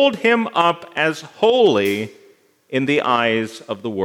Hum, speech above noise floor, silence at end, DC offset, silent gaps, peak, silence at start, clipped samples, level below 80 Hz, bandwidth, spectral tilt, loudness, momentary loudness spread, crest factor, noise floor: none; 34 dB; 0 s; under 0.1%; none; -2 dBFS; 0 s; under 0.1%; -70 dBFS; 17.5 kHz; -5 dB/octave; -18 LUFS; 11 LU; 16 dB; -52 dBFS